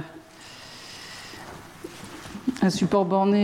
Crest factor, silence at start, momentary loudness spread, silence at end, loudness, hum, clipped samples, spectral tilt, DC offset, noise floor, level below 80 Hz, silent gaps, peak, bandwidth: 18 dB; 0 s; 20 LU; 0 s; -23 LUFS; none; under 0.1%; -6 dB/octave; under 0.1%; -45 dBFS; -58 dBFS; none; -10 dBFS; 16 kHz